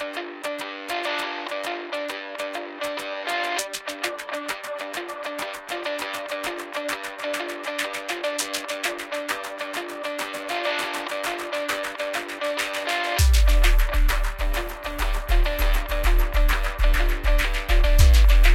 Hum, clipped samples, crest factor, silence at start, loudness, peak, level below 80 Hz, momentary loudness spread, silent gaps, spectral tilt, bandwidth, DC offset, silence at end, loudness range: none; under 0.1%; 18 dB; 0 s; -26 LUFS; -4 dBFS; -24 dBFS; 10 LU; none; -4 dB/octave; 16 kHz; under 0.1%; 0 s; 6 LU